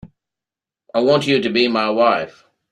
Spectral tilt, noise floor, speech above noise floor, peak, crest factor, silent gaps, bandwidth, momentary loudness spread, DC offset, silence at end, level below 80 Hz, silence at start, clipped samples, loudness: -5.5 dB/octave; -88 dBFS; 72 dB; -2 dBFS; 16 dB; none; 12 kHz; 8 LU; under 0.1%; 0.4 s; -60 dBFS; 0.05 s; under 0.1%; -17 LUFS